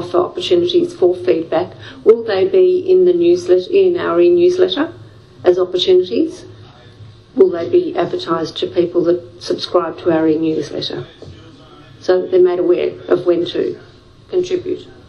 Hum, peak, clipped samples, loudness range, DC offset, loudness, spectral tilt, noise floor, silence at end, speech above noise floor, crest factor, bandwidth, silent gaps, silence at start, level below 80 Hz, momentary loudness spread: none; 0 dBFS; under 0.1%; 5 LU; under 0.1%; -15 LUFS; -6 dB/octave; -40 dBFS; 0.2 s; 26 dB; 16 dB; 7.8 kHz; none; 0 s; -54 dBFS; 10 LU